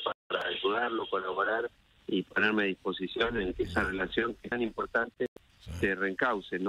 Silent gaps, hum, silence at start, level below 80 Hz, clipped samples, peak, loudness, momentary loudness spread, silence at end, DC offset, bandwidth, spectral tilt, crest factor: 0.15-0.30 s, 5.28-5.36 s; none; 0 s; -52 dBFS; under 0.1%; -14 dBFS; -31 LUFS; 7 LU; 0 s; under 0.1%; 12 kHz; -6 dB/octave; 18 dB